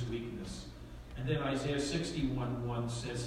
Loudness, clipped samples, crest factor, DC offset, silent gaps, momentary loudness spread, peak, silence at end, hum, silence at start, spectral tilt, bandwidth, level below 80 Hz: -37 LUFS; under 0.1%; 16 dB; under 0.1%; none; 13 LU; -20 dBFS; 0 s; none; 0 s; -5.5 dB/octave; 13.5 kHz; -50 dBFS